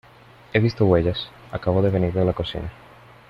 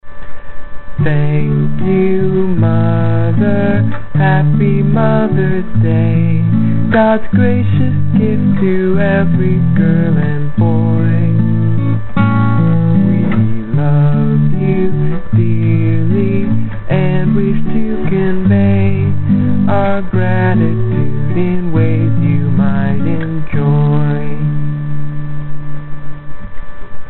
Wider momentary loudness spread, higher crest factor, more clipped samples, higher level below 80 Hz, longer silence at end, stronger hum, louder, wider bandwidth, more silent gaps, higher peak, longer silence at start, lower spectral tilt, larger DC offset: first, 13 LU vs 6 LU; first, 18 dB vs 12 dB; neither; second, -44 dBFS vs -30 dBFS; first, 0.55 s vs 0 s; neither; second, -22 LUFS vs -13 LUFS; first, 6.2 kHz vs 4.2 kHz; neither; second, -4 dBFS vs 0 dBFS; first, 0.55 s vs 0 s; about the same, -8.5 dB/octave vs -9 dB/octave; second, under 0.1% vs 10%